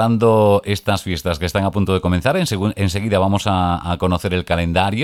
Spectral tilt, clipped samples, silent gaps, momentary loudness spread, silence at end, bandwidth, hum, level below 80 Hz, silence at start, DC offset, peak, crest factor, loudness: -6 dB/octave; under 0.1%; none; 6 LU; 0 s; 16 kHz; none; -36 dBFS; 0 s; under 0.1%; -2 dBFS; 16 dB; -18 LUFS